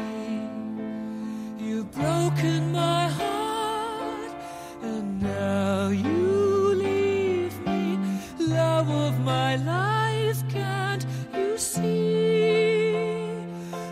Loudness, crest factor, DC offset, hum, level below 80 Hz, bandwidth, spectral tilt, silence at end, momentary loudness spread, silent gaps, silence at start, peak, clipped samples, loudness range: -26 LUFS; 14 dB; under 0.1%; none; -56 dBFS; 16 kHz; -6 dB/octave; 0 s; 11 LU; none; 0 s; -10 dBFS; under 0.1%; 3 LU